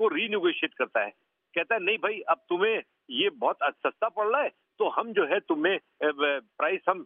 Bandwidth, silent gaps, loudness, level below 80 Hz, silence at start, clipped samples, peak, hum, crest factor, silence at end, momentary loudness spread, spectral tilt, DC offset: 3.8 kHz; none; -28 LUFS; -88 dBFS; 0 s; under 0.1%; -8 dBFS; none; 20 dB; 0 s; 5 LU; -0.5 dB/octave; under 0.1%